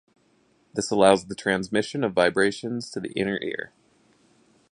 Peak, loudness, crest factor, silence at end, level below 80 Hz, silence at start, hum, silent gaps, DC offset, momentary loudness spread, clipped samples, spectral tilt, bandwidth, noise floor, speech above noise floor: -2 dBFS; -24 LUFS; 24 dB; 1.05 s; -60 dBFS; 0.75 s; none; none; under 0.1%; 13 LU; under 0.1%; -4.5 dB/octave; 11.5 kHz; -64 dBFS; 40 dB